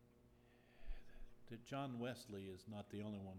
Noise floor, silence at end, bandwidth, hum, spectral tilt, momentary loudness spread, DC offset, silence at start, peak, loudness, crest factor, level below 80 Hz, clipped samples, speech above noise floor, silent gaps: -70 dBFS; 0 s; 16.5 kHz; none; -6 dB/octave; 16 LU; under 0.1%; 0 s; -36 dBFS; -52 LUFS; 16 dB; -60 dBFS; under 0.1%; 20 dB; none